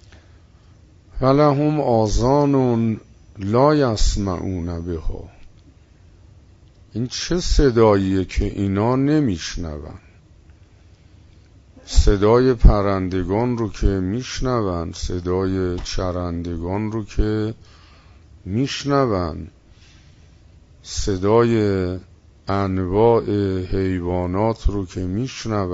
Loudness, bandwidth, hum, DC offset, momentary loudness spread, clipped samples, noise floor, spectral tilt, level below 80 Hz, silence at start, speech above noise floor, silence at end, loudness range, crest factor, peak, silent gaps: -20 LUFS; 8 kHz; none; under 0.1%; 13 LU; under 0.1%; -49 dBFS; -6.5 dB/octave; -28 dBFS; 1.15 s; 30 dB; 0 s; 6 LU; 20 dB; -2 dBFS; none